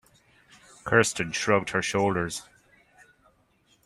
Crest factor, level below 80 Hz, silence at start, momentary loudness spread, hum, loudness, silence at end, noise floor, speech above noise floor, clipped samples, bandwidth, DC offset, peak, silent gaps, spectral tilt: 24 dB; -60 dBFS; 0.85 s; 12 LU; none; -25 LUFS; 1.45 s; -65 dBFS; 40 dB; under 0.1%; 14.5 kHz; under 0.1%; -4 dBFS; none; -4 dB/octave